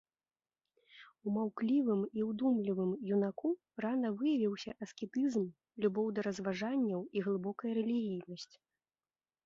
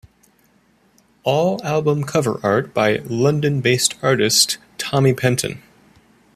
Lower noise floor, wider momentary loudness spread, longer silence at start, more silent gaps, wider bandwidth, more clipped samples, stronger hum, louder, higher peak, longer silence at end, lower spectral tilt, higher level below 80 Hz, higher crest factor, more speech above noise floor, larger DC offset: first, under -90 dBFS vs -58 dBFS; first, 10 LU vs 7 LU; second, 0.95 s vs 1.25 s; neither; second, 7.6 kHz vs 15 kHz; neither; neither; second, -36 LUFS vs -18 LUFS; second, -20 dBFS vs 0 dBFS; first, 1 s vs 0.75 s; first, -7 dB/octave vs -4 dB/octave; second, -78 dBFS vs -56 dBFS; about the same, 16 dB vs 18 dB; first, over 55 dB vs 40 dB; neither